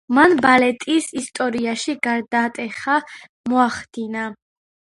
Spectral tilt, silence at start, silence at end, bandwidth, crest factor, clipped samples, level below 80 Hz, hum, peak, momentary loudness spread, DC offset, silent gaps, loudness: -3.5 dB/octave; 0.1 s; 0.55 s; 11.5 kHz; 20 dB; under 0.1%; -60 dBFS; none; 0 dBFS; 14 LU; under 0.1%; 3.29-3.44 s; -19 LUFS